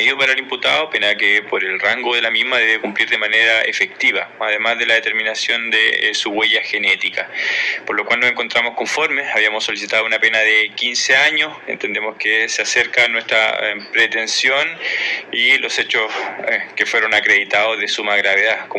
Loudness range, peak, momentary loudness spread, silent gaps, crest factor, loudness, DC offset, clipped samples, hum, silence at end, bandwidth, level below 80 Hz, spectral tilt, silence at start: 2 LU; -2 dBFS; 6 LU; none; 16 dB; -15 LUFS; under 0.1%; under 0.1%; none; 0 s; 12 kHz; -68 dBFS; -0.5 dB/octave; 0 s